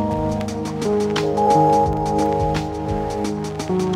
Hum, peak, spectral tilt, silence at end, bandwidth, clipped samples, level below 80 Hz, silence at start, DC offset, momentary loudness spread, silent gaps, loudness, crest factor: none; -4 dBFS; -6.5 dB/octave; 0 s; 15.5 kHz; under 0.1%; -36 dBFS; 0 s; under 0.1%; 9 LU; none; -20 LUFS; 16 dB